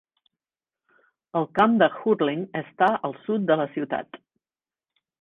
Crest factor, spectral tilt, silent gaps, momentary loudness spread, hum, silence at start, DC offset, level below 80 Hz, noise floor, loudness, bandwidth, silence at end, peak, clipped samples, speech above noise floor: 20 dB; -8 dB/octave; none; 11 LU; none; 1.35 s; under 0.1%; -68 dBFS; under -90 dBFS; -24 LUFS; 4.8 kHz; 1.05 s; -6 dBFS; under 0.1%; over 67 dB